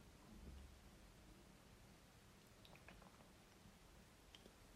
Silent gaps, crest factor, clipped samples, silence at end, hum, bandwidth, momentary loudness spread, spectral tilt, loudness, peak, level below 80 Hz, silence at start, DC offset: none; 20 dB; under 0.1%; 0 s; none; 15.5 kHz; 5 LU; -4.5 dB/octave; -65 LUFS; -44 dBFS; -68 dBFS; 0 s; under 0.1%